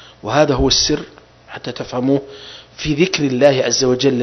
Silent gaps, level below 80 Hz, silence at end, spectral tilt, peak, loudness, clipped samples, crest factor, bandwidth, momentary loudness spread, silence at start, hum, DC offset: none; -36 dBFS; 0 s; -4 dB/octave; 0 dBFS; -16 LUFS; under 0.1%; 16 dB; 6.4 kHz; 21 LU; 0 s; none; under 0.1%